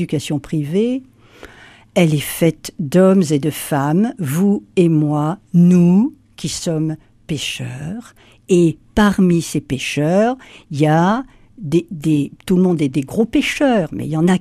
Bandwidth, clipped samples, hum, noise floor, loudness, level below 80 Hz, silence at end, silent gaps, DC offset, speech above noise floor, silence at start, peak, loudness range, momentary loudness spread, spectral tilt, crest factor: 15 kHz; under 0.1%; none; -43 dBFS; -17 LUFS; -46 dBFS; 0 s; none; under 0.1%; 27 dB; 0 s; -2 dBFS; 3 LU; 12 LU; -6.5 dB/octave; 14 dB